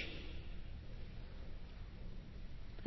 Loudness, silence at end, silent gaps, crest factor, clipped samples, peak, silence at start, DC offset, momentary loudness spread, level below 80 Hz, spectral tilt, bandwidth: -53 LUFS; 0 s; none; 18 dB; under 0.1%; -28 dBFS; 0 s; under 0.1%; 4 LU; -50 dBFS; -4.5 dB/octave; 6 kHz